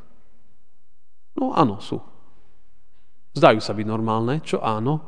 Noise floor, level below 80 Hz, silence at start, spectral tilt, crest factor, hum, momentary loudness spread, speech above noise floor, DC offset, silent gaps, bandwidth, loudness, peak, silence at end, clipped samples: -67 dBFS; -64 dBFS; 1.35 s; -7 dB/octave; 24 dB; none; 17 LU; 46 dB; 2%; none; 10 kHz; -22 LUFS; 0 dBFS; 0.05 s; under 0.1%